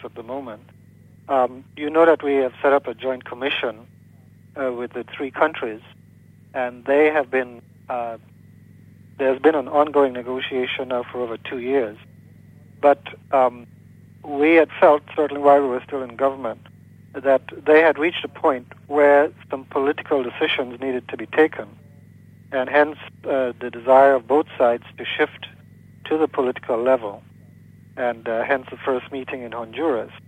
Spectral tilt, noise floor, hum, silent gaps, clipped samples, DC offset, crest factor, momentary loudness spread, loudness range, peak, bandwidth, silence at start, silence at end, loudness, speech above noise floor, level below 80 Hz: -6.5 dB/octave; -49 dBFS; none; none; under 0.1%; under 0.1%; 18 dB; 15 LU; 6 LU; -2 dBFS; 9 kHz; 0 s; 0.1 s; -21 LUFS; 29 dB; -66 dBFS